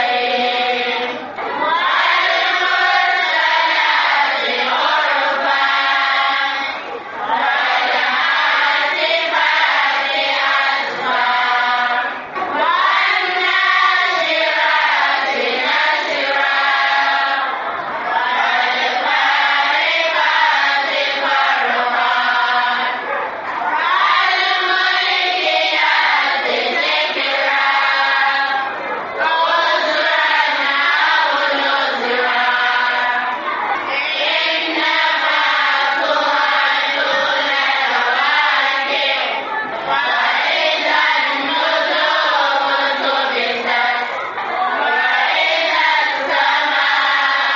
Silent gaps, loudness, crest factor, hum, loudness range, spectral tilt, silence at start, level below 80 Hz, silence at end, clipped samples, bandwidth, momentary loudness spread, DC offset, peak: none; -15 LUFS; 14 dB; none; 2 LU; 3.5 dB/octave; 0 s; -70 dBFS; 0 s; under 0.1%; 7.4 kHz; 6 LU; under 0.1%; -2 dBFS